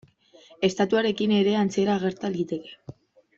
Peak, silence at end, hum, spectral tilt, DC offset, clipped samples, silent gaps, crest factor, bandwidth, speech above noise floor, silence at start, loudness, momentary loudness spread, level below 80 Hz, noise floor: -8 dBFS; 0.45 s; none; -6 dB/octave; under 0.1%; under 0.1%; none; 18 dB; 7.8 kHz; 30 dB; 0.6 s; -24 LUFS; 12 LU; -64 dBFS; -54 dBFS